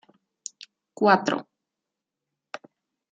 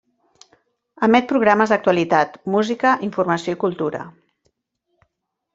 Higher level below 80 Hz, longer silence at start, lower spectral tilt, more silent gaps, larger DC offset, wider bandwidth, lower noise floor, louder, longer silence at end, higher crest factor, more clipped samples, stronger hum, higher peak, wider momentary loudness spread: second, -78 dBFS vs -62 dBFS; about the same, 1 s vs 1 s; second, -4.5 dB/octave vs -6 dB/octave; neither; neither; first, 9.4 kHz vs 7.8 kHz; first, -86 dBFS vs -76 dBFS; second, -23 LUFS vs -18 LUFS; first, 1.7 s vs 1.45 s; first, 24 dB vs 18 dB; neither; neither; about the same, -4 dBFS vs -2 dBFS; first, 22 LU vs 9 LU